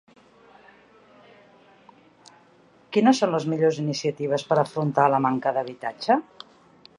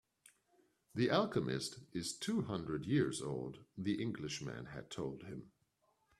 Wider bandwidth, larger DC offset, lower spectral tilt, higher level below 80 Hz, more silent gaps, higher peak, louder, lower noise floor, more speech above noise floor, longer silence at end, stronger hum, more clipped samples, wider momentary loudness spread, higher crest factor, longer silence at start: second, 11.5 kHz vs 13 kHz; neither; about the same, -6 dB/octave vs -5.5 dB/octave; about the same, -74 dBFS vs -70 dBFS; neither; first, -4 dBFS vs -20 dBFS; first, -23 LUFS vs -40 LUFS; second, -56 dBFS vs -79 dBFS; second, 34 dB vs 40 dB; about the same, 0.75 s vs 0.7 s; neither; neither; second, 8 LU vs 14 LU; about the same, 22 dB vs 22 dB; first, 2.9 s vs 0.95 s